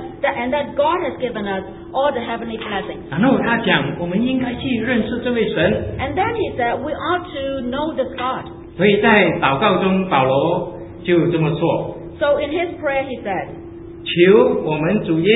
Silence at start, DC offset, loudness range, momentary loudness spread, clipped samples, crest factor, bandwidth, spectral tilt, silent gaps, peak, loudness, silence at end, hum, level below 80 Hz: 0 s; under 0.1%; 4 LU; 11 LU; under 0.1%; 18 dB; 4 kHz; -10.5 dB/octave; none; 0 dBFS; -18 LUFS; 0 s; none; -42 dBFS